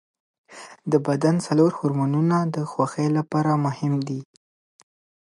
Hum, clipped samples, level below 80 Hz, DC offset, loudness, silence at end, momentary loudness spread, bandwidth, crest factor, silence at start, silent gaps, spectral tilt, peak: none; under 0.1%; -70 dBFS; under 0.1%; -22 LUFS; 1.1 s; 12 LU; 11.5 kHz; 18 dB; 0.5 s; none; -7.5 dB/octave; -6 dBFS